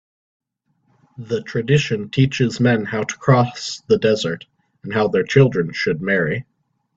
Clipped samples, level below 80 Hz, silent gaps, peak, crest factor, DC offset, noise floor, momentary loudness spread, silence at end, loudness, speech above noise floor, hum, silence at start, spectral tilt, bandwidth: under 0.1%; -54 dBFS; none; -2 dBFS; 18 dB; under 0.1%; -66 dBFS; 10 LU; 0.55 s; -19 LUFS; 48 dB; none; 1.2 s; -6 dB/octave; 7.8 kHz